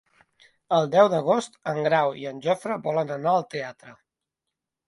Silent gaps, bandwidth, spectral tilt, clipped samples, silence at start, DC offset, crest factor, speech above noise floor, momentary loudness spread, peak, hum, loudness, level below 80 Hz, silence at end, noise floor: none; 11.5 kHz; -5.5 dB/octave; under 0.1%; 0.7 s; under 0.1%; 20 dB; 62 dB; 11 LU; -4 dBFS; none; -24 LUFS; -70 dBFS; 0.95 s; -85 dBFS